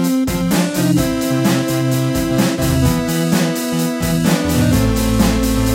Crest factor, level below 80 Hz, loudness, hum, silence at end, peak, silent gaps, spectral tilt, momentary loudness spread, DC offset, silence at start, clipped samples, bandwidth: 14 dB; -28 dBFS; -16 LUFS; none; 0 s; -2 dBFS; none; -5.5 dB/octave; 2 LU; under 0.1%; 0 s; under 0.1%; 17 kHz